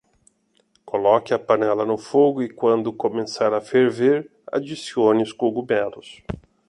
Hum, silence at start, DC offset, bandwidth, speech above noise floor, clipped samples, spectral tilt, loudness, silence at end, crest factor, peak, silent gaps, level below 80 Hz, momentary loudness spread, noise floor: none; 0.85 s; under 0.1%; 11 kHz; 44 dB; under 0.1%; -6 dB/octave; -21 LUFS; 0.3 s; 18 dB; -4 dBFS; none; -54 dBFS; 10 LU; -64 dBFS